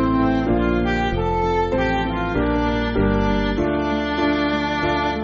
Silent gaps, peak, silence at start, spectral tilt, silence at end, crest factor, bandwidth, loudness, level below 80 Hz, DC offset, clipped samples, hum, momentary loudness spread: none; -6 dBFS; 0 s; -5 dB/octave; 0 s; 12 dB; 7.4 kHz; -20 LUFS; -30 dBFS; under 0.1%; under 0.1%; none; 2 LU